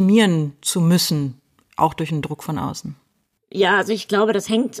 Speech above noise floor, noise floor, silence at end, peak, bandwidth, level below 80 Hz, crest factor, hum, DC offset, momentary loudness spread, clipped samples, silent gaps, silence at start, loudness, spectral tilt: 49 dB; -68 dBFS; 0 s; -4 dBFS; 15.5 kHz; -58 dBFS; 16 dB; none; under 0.1%; 13 LU; under 0.1%; none; 0 s; -20 LUFS; -5 dB/octave